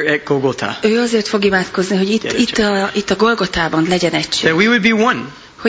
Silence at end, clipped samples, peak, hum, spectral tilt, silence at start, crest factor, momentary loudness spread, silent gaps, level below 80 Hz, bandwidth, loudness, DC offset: 0 s; under 0.1%; 0 dBFS; none; -4.5 dB/octave; 0 s; 14 dB; 6 LU; none; -44 dBFS; 8 kHz; -15 LUFS; under 0.1%